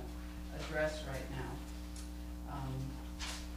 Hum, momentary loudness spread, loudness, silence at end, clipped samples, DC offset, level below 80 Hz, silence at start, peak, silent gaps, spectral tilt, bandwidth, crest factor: 60 Hz at -45 dBFS; 10 LU; -43 LUFS; 0 s; under 0.1%; under 0.1%; -46 dBFS; 0 s; -22 dBFS; none; -5 dB/octave; 15.5 kHz; 18 dB